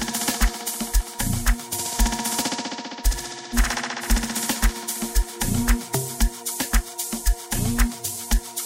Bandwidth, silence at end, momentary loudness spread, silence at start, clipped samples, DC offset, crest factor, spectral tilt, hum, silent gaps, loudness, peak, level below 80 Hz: 16.5 kHz; 0 s; 4 LU; 0 s; under 0.1%; under 0.1%; 18 dB; -3 dB/octave; none; none; -25 LUFS; -6 dBFS; -26 dBFS